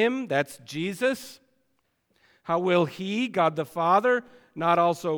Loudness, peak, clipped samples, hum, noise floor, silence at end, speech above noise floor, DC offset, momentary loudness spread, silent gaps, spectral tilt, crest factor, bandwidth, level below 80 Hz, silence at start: -25 LUFS; -10 dBFS; under 0.1%; none; -73 dBFS; 0 s; 48 dB; under 0.1%; 11 LU; none; -5.5 dB/octave; 16 dB; 19 kHz; -74 dBFS; 0 s